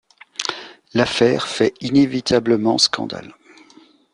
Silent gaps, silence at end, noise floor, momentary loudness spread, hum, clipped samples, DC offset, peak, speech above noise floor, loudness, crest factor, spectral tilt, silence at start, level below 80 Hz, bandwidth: none; 0.85 s; -50 dBFS; 13 LU; none; under 0.1%; under 0.1%; 0 dBFS; 32 dB; -18 LUFS; 18 dB; -4 dB/octave; 0.4 s; -54 dBFS; 11 kHz